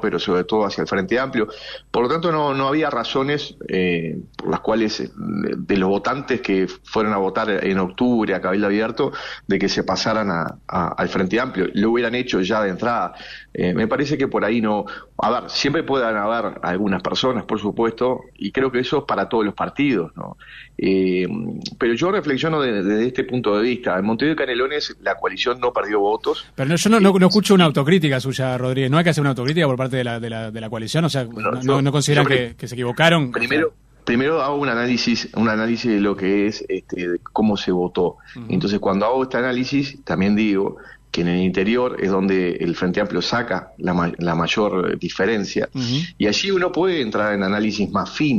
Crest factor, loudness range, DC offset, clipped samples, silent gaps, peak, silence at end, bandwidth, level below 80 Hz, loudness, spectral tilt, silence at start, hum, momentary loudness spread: 20 dB; 4 LU; under 0.1%; under 0.1%; none; 0 dBFS; 0 s; 14 kHz; -50 dBFS; -20 LUFS; -5.5 dB/octave; 0 s; none; 8 LU